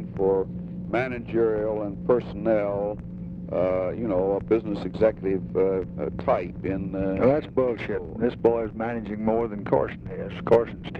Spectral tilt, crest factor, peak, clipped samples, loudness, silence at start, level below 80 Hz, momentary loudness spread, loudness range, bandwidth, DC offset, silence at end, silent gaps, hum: -9.5 dB/octave; 18 dB; -8 dBFS; under 0.1%; -26 LUFS; 0 s; -46 dBFS; 9 LU; 1 LU; 5.8 kHz; under 0.1%; 0 s; none; none